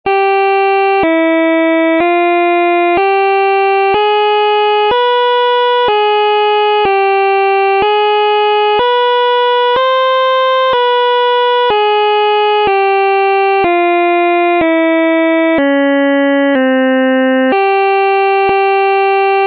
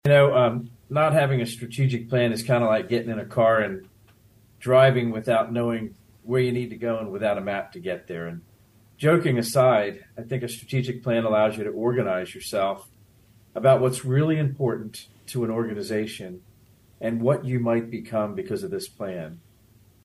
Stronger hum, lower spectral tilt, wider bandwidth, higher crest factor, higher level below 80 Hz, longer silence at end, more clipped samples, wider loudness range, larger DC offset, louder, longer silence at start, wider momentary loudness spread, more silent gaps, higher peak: neither; about the same, -6 dB/octave vs -6.5 dB/octave; second, 5.6 kHz vs 12.5 kHz; second, 6 dB vs 18 dB; first, -52 dBFS vs -60 dBFS; second, 0 s vs 0.65 s; neither; second, 0 LU vs 5 LU; neither; first, -10 LUFS vs -24 LUFS; about the same, 0.05 s vs 0.05 s; second, 0 LU vs 14 LU; neither; about the same, -4 dBFS vs -6 dBFS